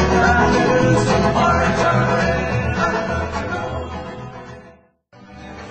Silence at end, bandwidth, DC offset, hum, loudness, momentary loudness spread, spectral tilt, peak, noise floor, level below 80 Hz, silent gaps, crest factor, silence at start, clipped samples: 0 s; 8.8 kHz; under 0.1%; none; -17 LUFS; 19 LU; -6 dB/octave; -2 dBFS; -49 dBFS; -32 dBFS; none; 16 dB; 0 s; under 0.1%